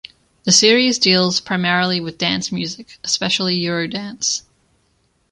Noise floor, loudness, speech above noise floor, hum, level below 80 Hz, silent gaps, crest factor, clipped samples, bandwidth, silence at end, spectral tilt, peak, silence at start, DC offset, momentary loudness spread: -63 dBFS; -16 LUFS; 45 dB; none; -58 dBFS; none; 18 dB; under 0.1%; 11 kHz; 0.9 s; -3 dB/octave; 0 dBFS; 0.45 s; under 0.1%; 13 LU